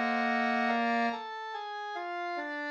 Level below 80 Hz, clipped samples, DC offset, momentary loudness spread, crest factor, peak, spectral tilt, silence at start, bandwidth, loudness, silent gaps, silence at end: -88 dBFS; under 0.1%; under 0.1%; 10 LU; 14 dB; -18 dBFS; -4.5 dB/octave; 0 s; 8.4 kHz; -32 LUFS; none; 0 s